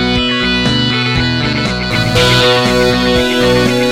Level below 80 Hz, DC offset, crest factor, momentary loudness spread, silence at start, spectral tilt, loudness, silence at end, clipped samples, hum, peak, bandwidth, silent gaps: -28 dBFS; under 0.1%; 12 dB; 5 LU; 0 s; -4.5 dB/octave; -11 LUFS; 0 s; under 0.1%; none; 0 dBFS; 16.5 kHz; none